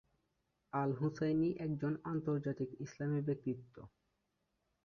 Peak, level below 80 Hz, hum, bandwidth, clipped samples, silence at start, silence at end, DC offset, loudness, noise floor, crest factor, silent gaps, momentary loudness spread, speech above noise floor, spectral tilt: -24 dBFS; -72 dBFS; none; 6.8 kHz; under 0.1%; 0.75 s; 0.95 s; under 0.1%; -39 LUFS; -84 dBFS; 16 dB; none; 9 LU; 46 dB; -8.5 dB/octave